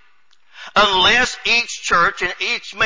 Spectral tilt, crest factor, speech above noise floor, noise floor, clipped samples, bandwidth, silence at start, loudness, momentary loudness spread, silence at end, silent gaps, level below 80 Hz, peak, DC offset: -1.5 dB/octave; 16 dB; 41 dB; -58 dBFS; under 0.1%; 7.6 kHz; 0.55 s; -15 LUFS; 9 LU; 0 s; none; -46 dBFS; -4 dBFS; under 0.1%